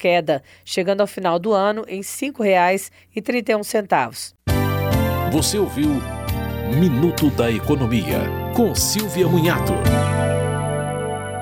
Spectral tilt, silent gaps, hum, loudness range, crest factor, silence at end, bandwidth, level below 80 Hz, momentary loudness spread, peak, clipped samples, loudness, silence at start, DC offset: -5.5 dB/octave; none; none; 2 LU; 16 dB; 0 s; 18.5 kHz; -36 dBFS; 8 LU; -4 dBFS; under 0.1%; -20 LUFS; 0 s; under 0.1%